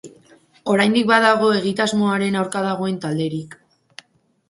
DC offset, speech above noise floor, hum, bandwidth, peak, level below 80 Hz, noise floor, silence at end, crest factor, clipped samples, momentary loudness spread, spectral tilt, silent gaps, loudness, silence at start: under 0.1%; 41 dB; none; 11.5 kHz; 0 dBFS; -64 dBFS; -59 dBFS; 0.95 s; 20 dB; under 0.1%; 11 LU; -5 dB/octave; none; -18 LUFS; 0.05 s